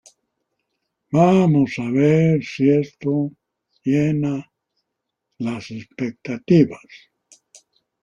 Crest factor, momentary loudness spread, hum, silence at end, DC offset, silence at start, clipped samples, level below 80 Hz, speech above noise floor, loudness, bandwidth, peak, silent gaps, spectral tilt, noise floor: 18 dB; 14 LU; none; 1.05 s; under 0.1%; 1.1 s; under 0.1%; -58 dBFS; 61 dB; -19 LUFS; 7.6 kHz; -2 dBFS; none; -8.5 dB/octave; -80 dBFS